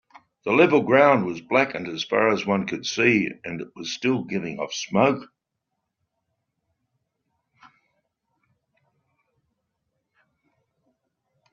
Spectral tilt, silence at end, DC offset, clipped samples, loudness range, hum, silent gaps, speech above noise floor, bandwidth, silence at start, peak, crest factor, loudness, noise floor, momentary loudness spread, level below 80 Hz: -4 dB/octave; 6.3 s; under 0.1%; under 0.1%; 9 LU; none; none; 59 dB; 7.2 kHz; 0.45 s; -4 dBFS; 22 dB; -22 LUFS; -81 dBFS; 15 LU; -68 dBFS